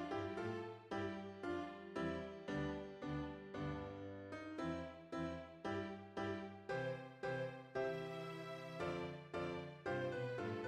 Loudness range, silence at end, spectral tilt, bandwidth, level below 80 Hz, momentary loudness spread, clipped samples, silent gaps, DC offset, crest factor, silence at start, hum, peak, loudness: 2 LU; 0 s; -7 dB/octave; 13.5 kHz; -66 dBFS; 5 LU; under 0.1%; none; under 0.1%; 16 dB; 0 s; none; -30 dBFS; -46 LUFS